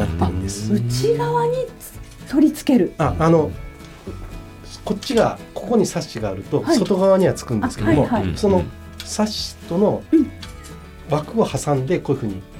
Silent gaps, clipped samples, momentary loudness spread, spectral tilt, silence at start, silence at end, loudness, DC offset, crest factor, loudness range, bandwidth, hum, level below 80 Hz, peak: none; under 0.1%; 19 LU; -6 dB/octave; 0 s; 0 s; -20 LUFS; under 0.1%; 16 dB; 3 LU; 17 kHz; none; -38 dBFS; -2 dBFS